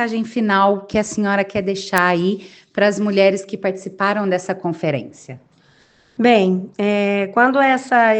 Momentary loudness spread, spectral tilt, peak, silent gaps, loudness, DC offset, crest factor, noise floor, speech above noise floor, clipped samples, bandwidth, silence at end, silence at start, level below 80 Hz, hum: 10 LU; -5.5 dB/octave; 0 dBFS; none; -18 LUFS; under 0.1%; 18 dB; -54 dBFS; 37 dB; under 0.1%; 9.4 kHz; 0 s; 0 s; -58 dBFS; none